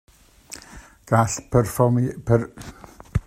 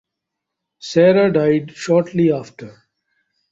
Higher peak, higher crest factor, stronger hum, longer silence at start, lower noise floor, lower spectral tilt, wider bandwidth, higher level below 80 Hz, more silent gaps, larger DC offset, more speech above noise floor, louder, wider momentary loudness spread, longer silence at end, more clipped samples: about the same, -2 dBFS vs -2 dBFS; about the same, 20 dB vs 16 dB; neither; second, 0.5 s vs 0.85 s; second, -45 dBFS vs -81 dBFS; about the same, -6.5 dB/octave vs -7 dB/octave; first, 15 kHz vs 8 kHz; first, -42 dBFS vs -60 dBFS; neither; neither; second, 24 dB vs 65 dB; second, -21 LUFS vs -16 LUFS; first, 20 LU vs 13 LU; second, 0.05 s vs 0.8 s; neither